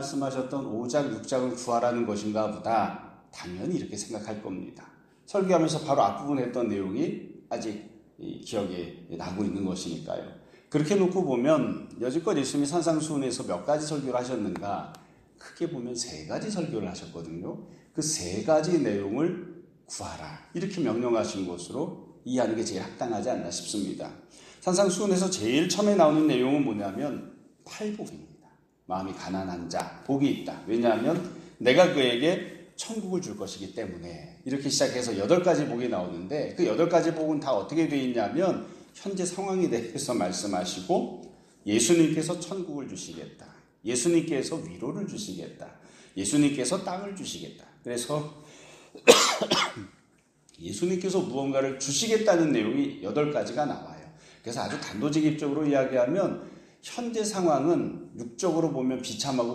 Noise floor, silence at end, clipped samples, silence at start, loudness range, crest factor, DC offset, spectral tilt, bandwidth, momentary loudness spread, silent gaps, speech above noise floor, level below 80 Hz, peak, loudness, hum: -64 dBFS; 0 s; under 0.1%; 0 s; 7 LU; 26 dB; under 0.1%; -4.5 dB/octave; 15.5 kHz; 16 LU; none; 36 dB; -66 dBFS; -2 dBFS; -28 LUFS; none